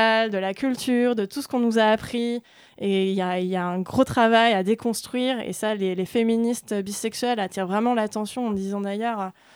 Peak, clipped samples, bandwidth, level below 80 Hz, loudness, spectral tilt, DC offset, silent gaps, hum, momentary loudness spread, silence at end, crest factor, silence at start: -6 dBFS; under 0.1%; 16.5 kHz; -60 dBFS; -24 LUFS; -5 dB/octave; under 0.1%; none; none; 8 LU; 0.25 s; 18 dB; 0 s